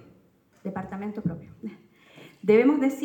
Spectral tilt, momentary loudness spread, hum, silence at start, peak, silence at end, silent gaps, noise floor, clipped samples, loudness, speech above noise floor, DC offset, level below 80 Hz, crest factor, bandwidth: -7.5 dB/octave; 22 LU; none; 0.65 s; -8 dBFS; 0 s; none; -61 dBFS; under 0.1%; -25 LUFS; 36 dB; under 0.1%; -64 dBFS; 18 dB; 17 kHz